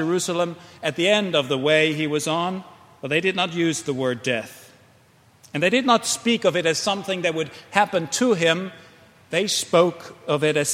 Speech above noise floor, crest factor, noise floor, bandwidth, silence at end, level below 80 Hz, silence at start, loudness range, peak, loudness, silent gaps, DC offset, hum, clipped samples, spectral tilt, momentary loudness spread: 34 dB; 22 dB; -55 dBFS; 16 kHz; 0 s; -68 dBFS; 0 s; 3 LU; 0 dBFS; -21 LUFS; none; under 0.1%; none; under 0.1%; -3.5 dB/octave; 10 LU